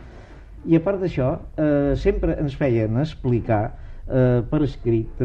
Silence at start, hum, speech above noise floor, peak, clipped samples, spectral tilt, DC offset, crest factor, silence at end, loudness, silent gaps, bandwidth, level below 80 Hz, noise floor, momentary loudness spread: 0 s; none; 20 dB; -6 dBFS; under 0.1%; -9.5 dB/octave; under 0.1%; 16 dB; 0 s; -22 LUFS; none; 7.2 kHz; -34 dBFS; -41 dBFS; 5 LU